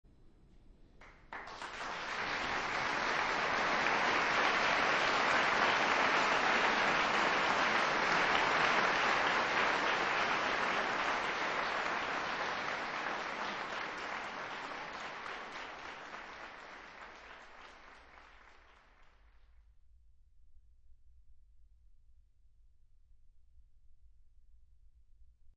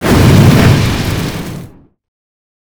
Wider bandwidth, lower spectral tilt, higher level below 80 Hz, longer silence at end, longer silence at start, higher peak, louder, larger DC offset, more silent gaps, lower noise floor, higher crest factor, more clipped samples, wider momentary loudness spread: second, 8.2 kHz vs over 20 kHz; second, -2.5 dB/octave vs -6 dB/octave; second, -62 dBFS vs -24 dBFS; second, 0.1 s vs 1 s; first, 0.25 s vs 0 s; second, -14 dBFS vs 0 dBFS; second, -32 LUFS vs -9 LUFS; neither; neither; first, -63 dBFS vs -33 dBFS; first, 22 dB vs 10 dB; second, under 0.1% vs 0.7%; about the same, 18 LU vs 18 LU